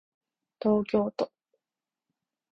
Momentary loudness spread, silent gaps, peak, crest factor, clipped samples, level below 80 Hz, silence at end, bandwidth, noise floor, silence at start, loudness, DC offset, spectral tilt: 9 LU; none; -12 dBFS; 20 dB; under 0.1%; -64 dBFS; 1.25 s; 6.8 kHz; under -90 dBFS; 0.6 s; -29 LUFS; under 0.1%; -8.5 dB/octave